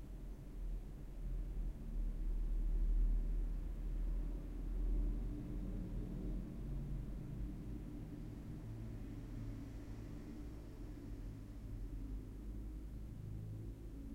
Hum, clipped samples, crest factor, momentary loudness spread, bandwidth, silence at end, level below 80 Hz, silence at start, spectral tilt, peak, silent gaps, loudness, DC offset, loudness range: none; under 0.1%; 14 dB; 9 LU; 5.8 kHz; 0 s; -44 dBFS; 0 s; -8.5 dB/octave; -28 dBFS; none; -47 LUFS; under 0.1%; 7 LU